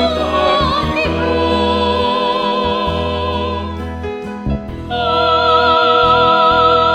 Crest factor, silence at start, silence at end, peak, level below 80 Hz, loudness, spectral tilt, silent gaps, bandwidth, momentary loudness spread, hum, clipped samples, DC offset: 14 dB; 0 s; 0 s; 0 dBFS; -30 dBFS; -14 LUFS; -6 dB/octave; none; 11 kHz; 13 LU; none; under 0.1%; 0.3%